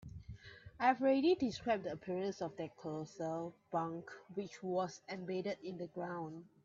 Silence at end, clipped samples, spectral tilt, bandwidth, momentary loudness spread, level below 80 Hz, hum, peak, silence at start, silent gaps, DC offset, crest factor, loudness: 0.2 s; under 0.1%; -6 dB/octave; 7.6 kHz; 16 LU; -68 dBFS; none; -20 dBFS; 0 s; none; under 0.1%; 20 dB; -39 LUFS